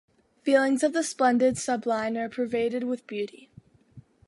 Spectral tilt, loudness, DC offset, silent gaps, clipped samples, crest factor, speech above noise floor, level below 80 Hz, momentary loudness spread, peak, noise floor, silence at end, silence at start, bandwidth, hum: -4 dB/octave; -26 LUFS; under 0.1%; none; under 0.1%; 18 dB; 28 dB; -66 dBFS; 11 LU; -8 dBFS; -53 dBFS; 0.3 s; 0.45 s; 11.5 kHz; none